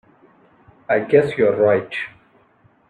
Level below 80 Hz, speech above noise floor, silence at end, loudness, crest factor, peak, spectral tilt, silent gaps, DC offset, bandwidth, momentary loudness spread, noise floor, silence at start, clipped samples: -62 dBFS; 39 dB; 0.8 s; -18 LUFS; 18 dB; -2 dBFS; -7.5 dB/octave; none; under 0.1%; 9.2 kHz; 13 LU; -56 dBFS; 0.9 s; under 0.1%